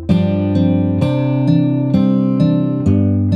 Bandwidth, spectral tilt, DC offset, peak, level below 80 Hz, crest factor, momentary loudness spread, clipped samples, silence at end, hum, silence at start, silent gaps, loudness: 7.2 kHz; -10 dB/octave; under 0.1%; -2 dBFS; -42 dBFS; 12 dB; 2 LU; under 0.1%; 0 s; none; 0 s; none; -15 LUFS